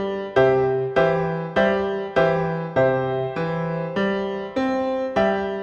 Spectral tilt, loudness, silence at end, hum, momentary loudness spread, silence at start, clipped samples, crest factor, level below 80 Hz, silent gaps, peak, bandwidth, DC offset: -7.5 dB/octave; -22 LUFS; 0 s; none; 6 LU; 0 s; under 0.1%; 16 dB; -50 dBFS; none; -6 dBFS; 7.2 kHz; under 0.1%